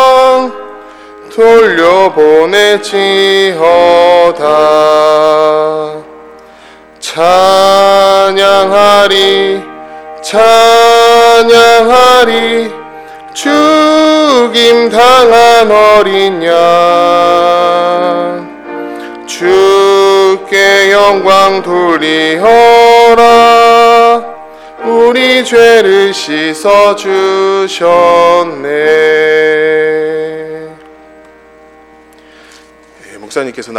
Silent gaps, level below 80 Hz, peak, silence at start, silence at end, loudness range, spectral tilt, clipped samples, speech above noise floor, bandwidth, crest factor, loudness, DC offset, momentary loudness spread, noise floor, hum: none; -44 dBFS; 0 dBFS; 0 s; 0 s; 4 LU; -3 dB/octave; 9%; 32 dB; 19.5 kHz; 6 dB; -6 LUFS; under 0.1%; 14 LU; -38 dBFS; none